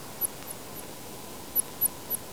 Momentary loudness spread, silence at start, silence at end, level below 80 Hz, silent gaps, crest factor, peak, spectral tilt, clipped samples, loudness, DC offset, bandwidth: 14 LU; 0 s; 0 s; -60 dBFS; none; 22 dB; -12 dBFS; -2 dB/octave; under 0.1%; -31 LUFS; 0.4%; over 20 kHz